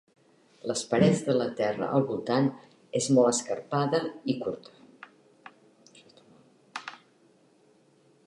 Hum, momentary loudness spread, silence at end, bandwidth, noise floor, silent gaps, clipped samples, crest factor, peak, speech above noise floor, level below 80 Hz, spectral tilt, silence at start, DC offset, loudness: none; 18 LU; 1.3 s; 11.5 kHz; -63 dBFS; none; under 0.1%; 20 dB; -10 dBFS; 36 dB; -68 dBFS; -5.5 dB/octave; 0.65 s; under 0.1%; -27 LUFS